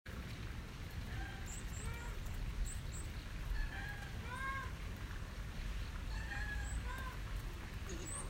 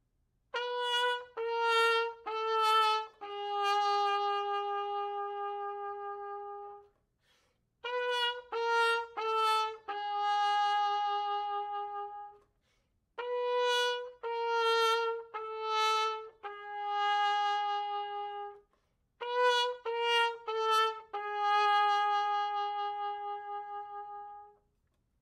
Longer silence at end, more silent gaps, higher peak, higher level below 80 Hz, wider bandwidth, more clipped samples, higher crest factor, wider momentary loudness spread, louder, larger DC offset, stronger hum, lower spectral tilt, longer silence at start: second, 0 s vs 0.75 s; neither; second, -28 dBFS vs -16 dBFS; first, -46 dBFS vs -80 dBFS; about the same, 16 kHz vs 15 kHz; neither; about the same, 14 dB vs 16 dB; second, 5 LU vs 15 LU; second, -46 LUFS vs -32 LUFS; neither; neither; first, -4 dB/octave vs 0.5 dB/octave; second, 0.05 s vs 0.55 s